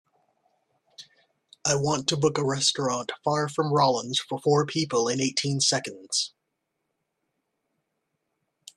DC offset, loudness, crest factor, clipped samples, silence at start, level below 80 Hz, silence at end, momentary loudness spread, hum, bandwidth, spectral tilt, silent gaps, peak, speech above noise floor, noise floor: under 0.1%; -25 LUFS; 20 dB; under 0.1%; 1 s; -66 dBFS; 2.5 s; 6 LU; none; 12.5 kHz; -3.5 dB/octave; none; -8 dBFS; 55 dB; -80 dBFS